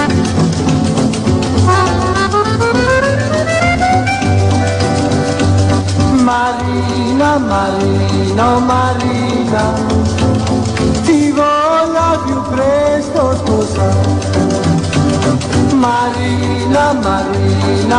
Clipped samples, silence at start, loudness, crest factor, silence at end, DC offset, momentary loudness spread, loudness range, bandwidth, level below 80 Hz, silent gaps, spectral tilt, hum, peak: under 0.1%; 0 s; -13 LUFS; 10 dB; 0 s; under 0.1%; 3 LU; 1 LU; 10.5 kHz; -34 dBFS; none; -6 dB/octave; none; -2 dBFS